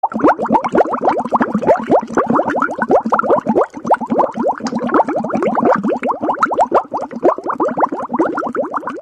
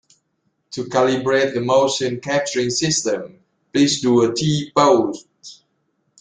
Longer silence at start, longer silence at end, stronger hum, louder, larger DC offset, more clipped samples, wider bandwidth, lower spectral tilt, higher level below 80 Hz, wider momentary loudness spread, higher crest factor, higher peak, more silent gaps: second, 0.05 s vs 0.7 s; second, 0 s vs 0.65 s; neither; about the same, -16 LUFS vs -18 LUFS; neither; neither; about the same, 9.8 kHz vs 9.6 kHz; first, -7 dB/octave vs -4 dB/octave; about the same, -54 dBFS vs -58 dBFS; second, 5 LU vs 11 LU; about the same, 14 dB vs 18 dB; about the same, -2 dBFS vs -2 dBFS; neither